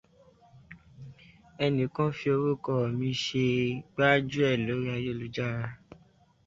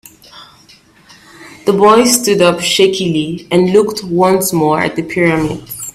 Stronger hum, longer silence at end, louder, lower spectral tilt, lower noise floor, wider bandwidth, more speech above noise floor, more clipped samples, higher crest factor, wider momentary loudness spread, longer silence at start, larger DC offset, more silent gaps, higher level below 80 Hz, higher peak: neither; first, 0.7 s vs 0.05 s; second, -29 LUFS vs -12 LUFS; first, -6.5 dB/octave vs -4 dB/octave; first, -62 dBFS vs -45 dBFS; second, 7.8 kHz vs 16 kHz; about the same, 34 dB vs 33 dB; neither; first, 22 dB vs 14 dB; first, 13 LU vs 8 LU; first, 0.55 s vs 0.35 s; neither; neither; second, -60 dBFS vs -46 dBFS; second, -8 dBFS vs 0 dBFS